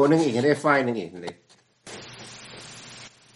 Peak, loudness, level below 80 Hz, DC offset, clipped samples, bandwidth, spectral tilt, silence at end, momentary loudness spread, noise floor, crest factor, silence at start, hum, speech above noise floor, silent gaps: -4 dBFS; -22 LUFS; -68 dBFS; under 0.1%; under 0.1%; 11.5 kHz; -5.5 dB/octave; 0.3 s; 21 LU; -50 dBFS; 22 dB; 0 s; none; 28 dB; none